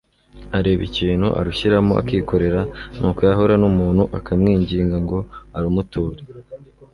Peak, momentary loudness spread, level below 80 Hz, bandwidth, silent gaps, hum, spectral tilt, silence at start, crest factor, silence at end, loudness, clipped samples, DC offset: -2 dBFS; 11 LU; -34 dBFS; 11 kHz; none; none; -8.5 dB/octave; 0.35 s; 16 dB; 0.3 s; -19 LUFS; under 0.1%; under 0.1%